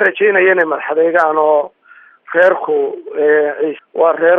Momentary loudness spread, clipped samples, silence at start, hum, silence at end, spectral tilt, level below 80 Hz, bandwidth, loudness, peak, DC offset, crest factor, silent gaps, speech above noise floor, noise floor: 8 LU; under 0.1%; 0 s; none; 0 s; -6.5 dB/octave; -74 dBFS; 5 kHz; -13 LUFS; 0 dBFS; under 0.1%; 12 dB; none; 32 dB; -45 dBFS